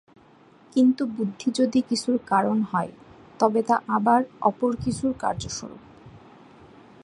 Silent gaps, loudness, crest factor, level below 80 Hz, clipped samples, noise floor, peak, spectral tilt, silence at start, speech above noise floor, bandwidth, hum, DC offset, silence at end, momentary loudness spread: none; -24 LUFS; 20 dB; -54 dBFS; under 0.1%; -54 dBFS; -4 dBFS; -5.5 dB/octave; 0.75 s; 30 dB; 11.5 kHz; none; under 0.1%; 0.85 s; 8 LU